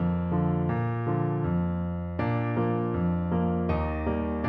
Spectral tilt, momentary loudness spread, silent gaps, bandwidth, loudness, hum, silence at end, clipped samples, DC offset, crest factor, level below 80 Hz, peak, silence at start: -11.5 dB/octave; 2 LU; none; 4.5 kHz; -28 LUFS; none; 0 s; under 0.1%; under 0.1%; 14 dB; -40 dBFS; -14 dBFS; 0 s